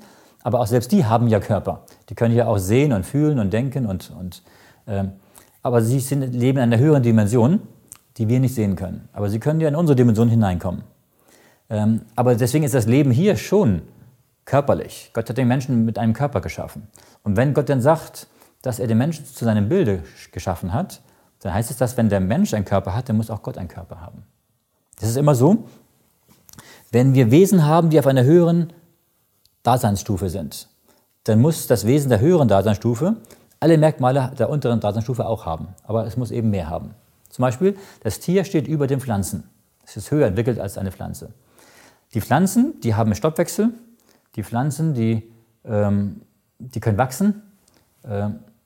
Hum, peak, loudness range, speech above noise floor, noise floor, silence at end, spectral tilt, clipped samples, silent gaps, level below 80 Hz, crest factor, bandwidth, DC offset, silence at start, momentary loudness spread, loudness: none; -2 dBFS; 6 LU; 49 dB; -67 dBFS; 0.25 s; -7.5 dB/octave; under 0.1%; none; -50 dBFS; 18 dB; 17 kHz; under 0.1%; 0.45 s; 15 LU; -20 LUFS